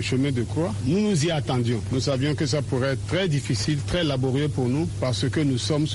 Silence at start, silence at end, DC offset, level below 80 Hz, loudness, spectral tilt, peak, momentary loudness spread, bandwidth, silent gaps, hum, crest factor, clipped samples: 0 s; 0 s; under 0.1%; -44 dBFS; -24 LUFS; -5.5 dB/octave; -12 dBFS; 2 LU; 11.5 kHz; none; none; 12 dB; under 0.1%